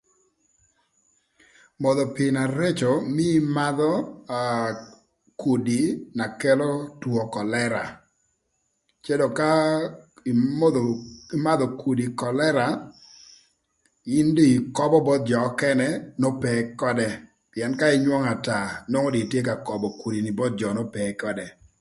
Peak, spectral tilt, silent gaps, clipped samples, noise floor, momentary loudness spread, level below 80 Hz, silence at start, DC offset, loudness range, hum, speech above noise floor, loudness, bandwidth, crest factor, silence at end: -6 dBFS; -6 dB/octave; none; under 0.1%; -74 dBFS; 10 LU; -60 dBFS; 1.8 s; under 0.1%; 4 LU; none; 51 dB; -24 LUFS; 11.5 kHz; 18 dB; 0.3 s